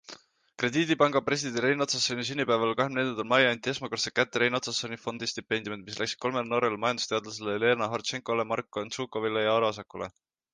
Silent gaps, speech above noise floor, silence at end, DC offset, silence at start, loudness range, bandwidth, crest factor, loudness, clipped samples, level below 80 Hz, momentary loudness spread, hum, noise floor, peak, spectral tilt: none; 22 dB; 0.45 s; under 0.1%; 0.1 s; 3 LU; 10 kHz; 20 dB; -28 LUFS; under 0.1%; -68 dBFS; 9 LU; none; -51 dBFS; -8 dBFS; -3.5 dB/octave